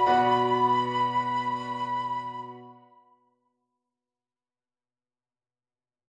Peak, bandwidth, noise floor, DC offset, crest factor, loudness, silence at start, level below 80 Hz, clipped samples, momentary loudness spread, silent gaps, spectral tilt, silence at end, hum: -10 dBFS; 9.4 kHz; under -90 dBFS; under 0.1%; 18 dB; -26 LUFS; 0 s; -70 dBFS; under 0.1%; 16 LU; none; -6 dB/octave; 3.45 s; none